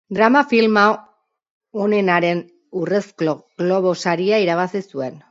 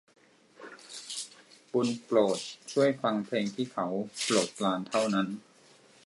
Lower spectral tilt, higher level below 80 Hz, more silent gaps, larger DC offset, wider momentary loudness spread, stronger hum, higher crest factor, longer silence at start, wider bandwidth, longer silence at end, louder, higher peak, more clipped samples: first, -6 dB/octave vs -4 dB/octave; first, -68 dBFS vs -80 dBFS; first, 1.50-1.61 s vs none; neither; second, 13 LU vs 17 LU; neither; about the same, 18 dB vs 20 dB; second, 0.1 s vs 0.6 s; second, 7.8 kHz vs 11.5 kHz; second, 0.1 s vs 0.7 s; first, -18 LUFS vs -30 LUFS; first, 0 dBFS vs -12 dBFS; neither